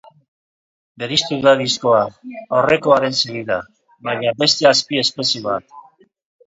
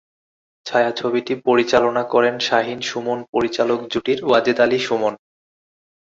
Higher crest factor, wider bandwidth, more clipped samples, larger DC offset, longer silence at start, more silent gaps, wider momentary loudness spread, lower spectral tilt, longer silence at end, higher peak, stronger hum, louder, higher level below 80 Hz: about the same, 18 dB vs 18 dB; about the same, 8 kHz vs 7.8 kHz; neither; neither; first, 1 s vs 0.65 s; second, none vs 3.29-3.33 s; first, 12 LU vs 7 LU; about the same, -3.5 dB/octave vs -4.5 dB/octave; second, 0.65 s vs 0.85 s; about the same, 0 dBFS vs -2 dBFS; neither; about the same, -17 LUFS vs -19 LUFS; about the same, -58 dBFS vs -58 dBFS